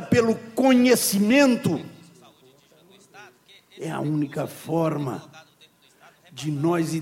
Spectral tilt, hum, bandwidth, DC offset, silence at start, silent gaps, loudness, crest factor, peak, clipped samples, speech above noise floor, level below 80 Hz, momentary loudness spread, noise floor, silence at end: -5 dB/octave; none; 17 kHz; under 0.1%; 0 s; none; -22 LUFS; 18 dB; -6 dBFS; under 0.1%; 35 dB; -62 dBFS; 16 LU; -57 dBFS; 0 s